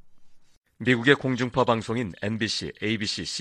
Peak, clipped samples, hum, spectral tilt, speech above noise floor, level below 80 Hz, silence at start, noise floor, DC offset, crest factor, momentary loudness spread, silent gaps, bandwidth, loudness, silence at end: -2 dBFS; under 0.1%; none; -4.5 dB/octave; 21 dB; -56 dBFS; 0.05 s; -46 dBFS; under 0.1%; 24 dB; 9 LU; 0.57-0.62 s; 11 kHz; -25 LUFS; 0 s